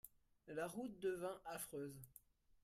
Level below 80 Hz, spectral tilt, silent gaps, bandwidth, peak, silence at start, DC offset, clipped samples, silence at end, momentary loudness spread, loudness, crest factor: -78 dBFS; -4.5 dB/octave; none; 15.5 kHz; -34 dBFS; 0.05 s; under 0.1%; under 0.1%; 0.1 s; 18 LU; -48 LUFS; 16 dB